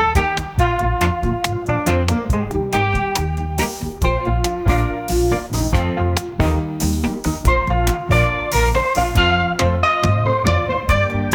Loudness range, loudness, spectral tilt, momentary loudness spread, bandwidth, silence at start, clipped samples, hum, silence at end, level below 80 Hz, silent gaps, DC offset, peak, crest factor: 3 LU; -18 LUFS; -5.5 dB/octave; 4 LU; 19.5 kHz; 0 s; under 0.1%; none; 0 s; -24 dBFS; none; under 0.1%; -2 dBFS; 16 dB